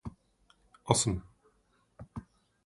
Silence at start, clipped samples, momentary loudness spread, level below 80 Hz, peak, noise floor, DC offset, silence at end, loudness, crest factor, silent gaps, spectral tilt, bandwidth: 0.05 s; under 0.1%; 22 LU; -54 dBFS; -6 dBFS; -71 dBFS; under 0.1%; 0.45 s; -30 LUFS; 30 dB; none; -4 dB/octave; 11.5 kHz